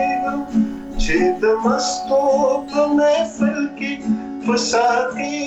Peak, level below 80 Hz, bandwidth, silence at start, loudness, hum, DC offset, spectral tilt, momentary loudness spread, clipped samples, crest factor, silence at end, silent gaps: -8 dBFS; -34 dBFS; 8.4 kHz; 0 s; -19 LUFS; none; under 0.1%; -4 dB/octave; 7 LU; under 0.1%; 10 dB; 0 s; none